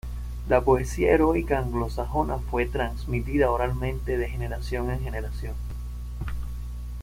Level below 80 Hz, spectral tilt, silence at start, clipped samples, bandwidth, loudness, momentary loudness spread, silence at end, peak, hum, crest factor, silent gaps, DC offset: -32 dBFS; -7 dB/octave; 0.05 s; under 0.1%; 16 kHz; -27 LUFS; 15 LU; 0 s; -6 dBFS; 60 Hz at -30 dBFS; 20 dB; none; under 0.1%